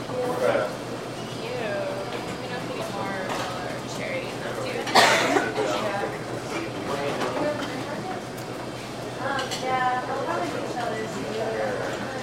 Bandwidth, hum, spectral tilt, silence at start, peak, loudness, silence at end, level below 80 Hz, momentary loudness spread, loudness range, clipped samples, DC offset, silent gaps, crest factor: 16 kHz; none; -4 dB/octave; 0 s; -4 dBFS; -27 LUFS; 0 s; -56 dBFS; 10 LU; 6 LU; under 0.1%; under 0.1%; none; 24 dB